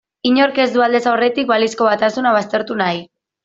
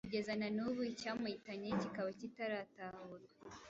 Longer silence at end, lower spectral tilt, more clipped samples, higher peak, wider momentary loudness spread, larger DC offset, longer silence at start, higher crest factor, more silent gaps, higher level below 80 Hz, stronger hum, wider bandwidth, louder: first, 0.4 s vs 0 s; about the same, -4.5 dB/octave vs -4.5 dB/octave; neither; first, -2 dBFS vs -28 dBFS; second, 5 LU vs 13 LU; neither; first, 0.25 s vs 0.05 s; about the same, 14 dB vs 16 dB; neither; first, -62 dBFS vs -74 dBFS; neither; about the same, 7.8 kHz vs 8 kHz; first, -16 LUFS vs -43 LUFS